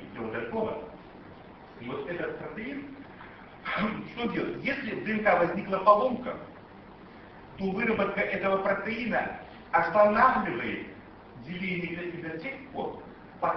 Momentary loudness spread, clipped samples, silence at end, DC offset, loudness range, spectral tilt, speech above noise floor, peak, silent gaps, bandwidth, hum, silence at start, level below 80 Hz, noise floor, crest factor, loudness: 25 LU; under 0.1%; 0 s; under 0.1%; 10 LU; -8 dB/octave; 21 dB; -8 dBFS; none; 6 kHz; none; 0 s; -58 dBFS; -49 dBFS; 22 dB; -29 LUFS